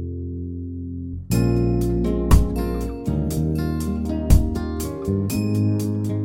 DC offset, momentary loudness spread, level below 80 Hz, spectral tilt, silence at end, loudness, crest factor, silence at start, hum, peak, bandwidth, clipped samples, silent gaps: under 0.1%; 12 LU; -26 dBFS; -7.5 dB/octave; 0 s; -23 LUFS; 20 dB; 0 s; none; -2 dBFS; 17 kHz; under 0.1%; none